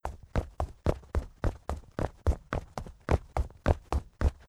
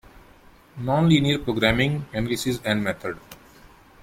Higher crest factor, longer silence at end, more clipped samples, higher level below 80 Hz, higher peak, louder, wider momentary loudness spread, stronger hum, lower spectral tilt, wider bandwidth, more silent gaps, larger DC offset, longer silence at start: about the same, 24 dB vs 22 dB; second, 0.15 s vs 0.65 s; neither; first, -34 dBFS vs -44 dBFS; second, -8 dBFS vs -2 dBFS; second, -34 LUFS vs -23 LUFS; second, 8 LU vs 14 LU; neither; first, -7.5 dB/octave vs -5.5 dB/octave; second, 11.5 kHz vs 16.5 kHz; neither; neither; about the same, 0.05 s vs 0.15 s